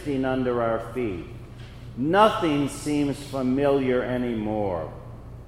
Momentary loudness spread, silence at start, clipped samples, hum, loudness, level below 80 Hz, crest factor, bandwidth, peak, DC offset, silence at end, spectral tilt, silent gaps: 21 LU; 0 s; under 0.1%; none; -24 LUFS; -46 dBFS; 20 dB; 15.5 kHz; -4 dBFS; under 0.1%; 0 s; -6.5 dB/octave; none